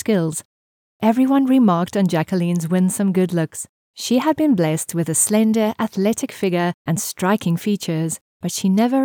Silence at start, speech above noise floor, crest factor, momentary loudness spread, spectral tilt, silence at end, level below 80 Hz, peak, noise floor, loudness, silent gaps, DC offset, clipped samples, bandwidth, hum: 0.05 s; over 72 dB; 16 dB; 9 LU; -5.5 dB/octave; 0 s; -64 dBFS; -2 dBFS; under -90 dBFS; -19 LUFS; 0.45-1.00 s, 3.69-3.94 s, 6.74-6.85 s, 8.21-8.40 s; under 0.1%; under 0.1%; 19 kHz; none